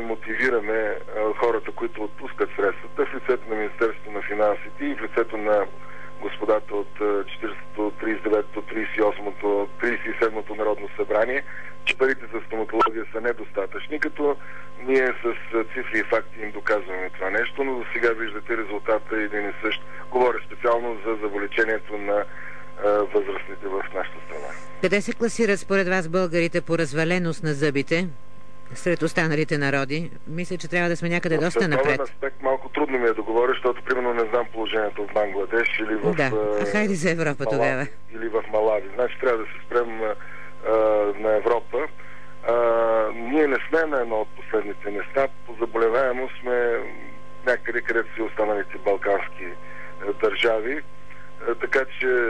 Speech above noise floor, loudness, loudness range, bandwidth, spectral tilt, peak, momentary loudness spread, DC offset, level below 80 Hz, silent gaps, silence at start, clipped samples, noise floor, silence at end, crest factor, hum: 20 dB; -24 LUFS; 3 LU; 11 kHz; -5.5 dB/octave; -10 dBFS; 10 LU; 3%; -58 dBFS; none; 0 s; under 0.1%; -44 dBFS; 0 s; 14 dB; 50 Hz at -55 dBFS